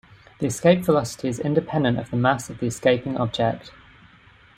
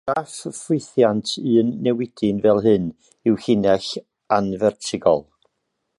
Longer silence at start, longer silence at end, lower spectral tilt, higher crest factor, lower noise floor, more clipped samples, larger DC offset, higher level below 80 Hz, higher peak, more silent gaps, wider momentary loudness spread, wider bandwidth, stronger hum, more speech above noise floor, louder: first, 0.4 s vs 0.05 s; about the same, 0.85 s vs 0.8 s; about the same, -6 dB/octave vs -6 dB/octave; about the same, 20 dB vs 18 dB; second, -52 dBFS vs -75 dBFS; neither; neither; about the same, -54 dBFS vs -56 dBFS; about the same, -2 dBFS vs -2 dBFS; neither; about the same, 9 LU vs 8 LU; first, 16 kHz vs 11.5 kHz; neither; second, 30 dB vs 55 dB; about the same, -22 LUFS vs -20 LUFS